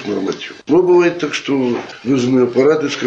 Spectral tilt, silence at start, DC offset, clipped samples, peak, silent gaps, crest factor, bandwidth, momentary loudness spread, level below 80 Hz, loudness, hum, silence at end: -5.5 dB/octave; 0 s; under 0.1%; under 0.1%; -2 dBFS; none; 12 dB; 7.8 kHz; 10 LU; -58 dBFS; -15 LUFS; none; 0 s